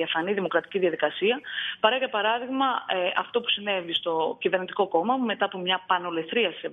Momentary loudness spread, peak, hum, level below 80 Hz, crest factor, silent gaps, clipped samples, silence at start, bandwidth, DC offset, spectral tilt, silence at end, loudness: 3 LU; -6 dBFS; none; -76 dBFS; 20 dB; none; under 0.1%; 0 s; 3.9 kHz; under 0.1%; -6.5 dB/octave; 0 s; -26 LUFS